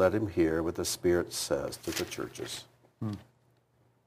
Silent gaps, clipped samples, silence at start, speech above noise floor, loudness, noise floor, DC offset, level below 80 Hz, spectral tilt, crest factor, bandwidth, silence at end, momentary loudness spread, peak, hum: none; under 0.1%; 0 s; 37 dB; -32 LUFS; -69 dBFS; under 0.1%; -56 dBFS; -4.5 dB/octave; 20 dB; 15.5 kHz; 0.85 s; 12 LU; -12 dBFS; none